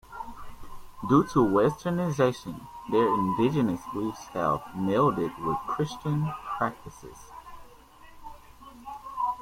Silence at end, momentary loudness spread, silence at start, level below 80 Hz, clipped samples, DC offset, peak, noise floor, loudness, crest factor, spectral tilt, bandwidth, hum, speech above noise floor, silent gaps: 0 s; 23 LU; 0.1 s; -54 dBFS; under 0.1%; under 0.1%; -8 dBFS; -51 dBFS; -27 LUFS; 20 dB; -7.5 dB/octave; 16.5 kHz; none; 25 dB; none